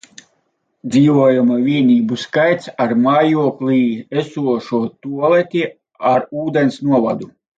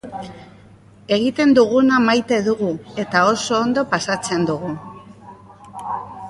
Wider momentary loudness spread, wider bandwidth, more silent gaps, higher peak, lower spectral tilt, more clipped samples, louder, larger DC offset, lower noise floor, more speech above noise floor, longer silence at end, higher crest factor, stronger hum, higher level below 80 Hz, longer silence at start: second, 8 LU vs 19 LU; second, 7.8 kHz vs 11.5 kHz; neither; about the same, -2 dBFS vs -2 dBFS; first, -7 dB/octave vs -4.5 dB/octave; neither; about the same, -16 LUFS vs -18 LUFS; neither; first, -66 dBFS vs -46 dBFS; first, 51 dB vs 28 dB; first, 0.3 s vs 0 s; about the same, 14 dB vs 18 dB; neither; second, -62 dBFS vs -56 dBFS; first, 0.85 s vs 0.05 s